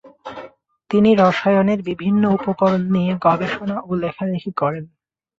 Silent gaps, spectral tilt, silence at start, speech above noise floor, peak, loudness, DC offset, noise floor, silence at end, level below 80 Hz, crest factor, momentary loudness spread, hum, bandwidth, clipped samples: none; -8 dB/octave; 0.05 s; 25 dB; -2 dBFS; -18 LUFS; under 0.1%; -42 dBFS; 0.55 s; -54 dBFS; 16 dB; 14 LU; none; 7.2 kHz; under 0.1%